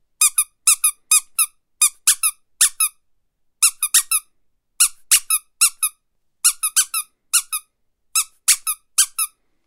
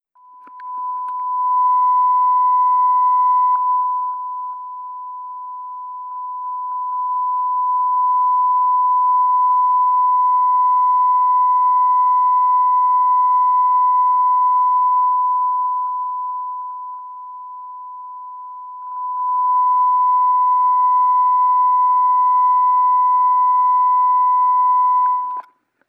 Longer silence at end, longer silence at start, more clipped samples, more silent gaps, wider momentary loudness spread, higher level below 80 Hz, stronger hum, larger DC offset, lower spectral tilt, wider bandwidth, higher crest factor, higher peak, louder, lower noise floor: about the same, 0.4 s vs 0.5 s; second, 0.2 s vs 0.45 s; neither; neither; second, 7 LU vs 16 LU; first, -64 dBFS vs under -90 dBFS; neither; neither; second, 7.5 dB/octave vs -3 dB/octave; first, 19 kHz vs 2.1 kHz; first, 20 dB vs 6 dB; first, 0 dBFS vs -10 dBFS; about the same, -17 LUFS vs -15 LUFS; first, -66 dBFS vs -44 dBFS